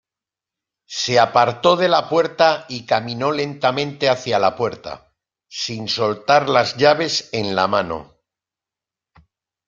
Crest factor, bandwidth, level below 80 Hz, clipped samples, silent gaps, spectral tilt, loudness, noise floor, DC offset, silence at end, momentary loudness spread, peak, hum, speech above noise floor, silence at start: 18 dB; 7.6 kHz; -60 dBFS; under 0.1%; none; -4 dB/octave; -18 LUFS; -88 dBFS; under 0.1%; 1.65 s; 12 LU; -2 dBFS; none; 70 dB; 0.9 s